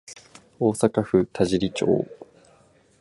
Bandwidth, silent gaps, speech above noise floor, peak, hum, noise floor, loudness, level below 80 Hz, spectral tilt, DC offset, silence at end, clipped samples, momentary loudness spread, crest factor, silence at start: 11.5 kHz; none; 36 dB; -4 dBFS; none; -58 dBFS; -23 LUFS; -52 dBFS; -6 dB/octave; under 0.1%; 0.75 s; under 0.1%; 14 LU; 20 dB; 0.1 s